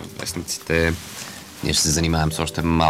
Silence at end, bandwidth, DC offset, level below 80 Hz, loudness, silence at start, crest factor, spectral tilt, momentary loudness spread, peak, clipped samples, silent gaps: 0 s; 16.5 kHz; under 0.1%; -36 dBFS; -21 LUFS; 0 s; 18 dB; -4 dB/octave; 14 LU; -4 dBFS; under 0.1%; none